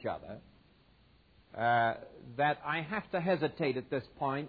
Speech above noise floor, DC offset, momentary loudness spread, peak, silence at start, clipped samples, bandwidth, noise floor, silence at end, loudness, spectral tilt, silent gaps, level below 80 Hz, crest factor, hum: 31 dB; under 0.1%; 16 LU; -18 dBFS; 0 s; under 0.1%; 5 kHz; -64 dBFS; 0 s; -33 LUFS; -9 dB/octave; none; -66 dBFS; 18 dB; none